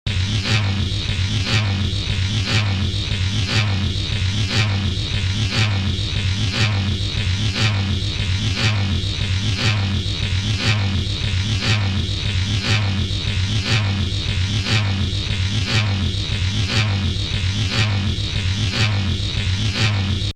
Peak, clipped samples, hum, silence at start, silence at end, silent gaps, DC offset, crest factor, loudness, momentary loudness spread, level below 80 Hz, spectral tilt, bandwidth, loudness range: -4 dBFS; under 0.1%; none; 0.05 s; 0 s; none; under 0.1%; 14 dB; -20 LUFS; 3 LU; -32 dBFS; -4.5 dB/octave; 10 kHz; 0 LU